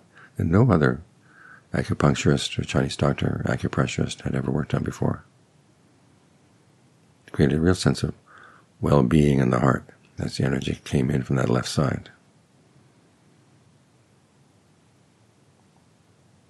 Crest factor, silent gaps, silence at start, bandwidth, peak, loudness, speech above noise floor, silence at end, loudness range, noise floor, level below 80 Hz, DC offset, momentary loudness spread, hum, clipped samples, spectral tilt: 22 dB; none; 0.4 s; 12 kHz; -4 dBFS; -23 LUFS; 37 dB; 4.45 s; 7 LU; -59 dBFS; -46 dBFS; under 0.1%; 11 LU; none; under 0.1%; -6.5 dB/octave